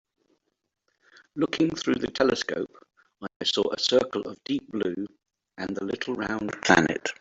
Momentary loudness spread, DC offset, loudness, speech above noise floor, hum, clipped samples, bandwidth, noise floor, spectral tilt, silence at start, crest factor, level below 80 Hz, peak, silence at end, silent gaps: 16 LU; under 0.1%; -26 LUFS; 45 dB; none; under 0.1%; 8 kHz; -72 dBFS; -4 dB/octave; 1.35 s; 26 dB; -60 dBFS; -2 dBFS; 0.05 s; 3.36-3.40 s